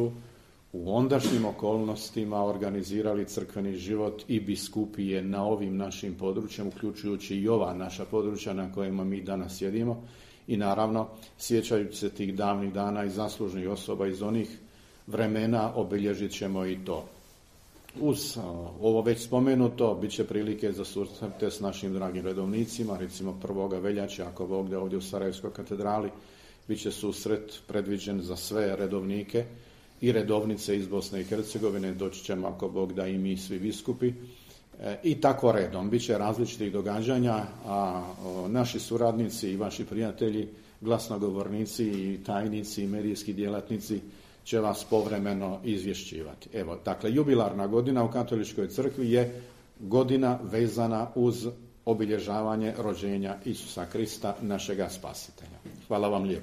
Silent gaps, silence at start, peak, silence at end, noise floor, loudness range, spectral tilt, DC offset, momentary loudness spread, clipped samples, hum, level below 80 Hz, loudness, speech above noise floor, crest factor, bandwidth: none; 0 s; -8 dBFS; 0 s; -56 dBFS; 5 LU; -6 dB/octave; under 0.1%; 10 LU; under 0.1%; none; -58 dBFS; -30 LUFS; 26 dB; 22 dB; 15 kHz